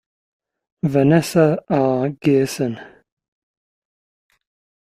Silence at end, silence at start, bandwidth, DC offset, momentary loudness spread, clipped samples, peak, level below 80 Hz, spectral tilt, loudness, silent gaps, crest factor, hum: 2.05 s; 0.85 s; 15.5 kHz; under 0.1%; 10 LU; under 0.1%; -2 dBFS; -58 dBFS; -7 dB/octave; -18 LUFS; none; 18 dB; none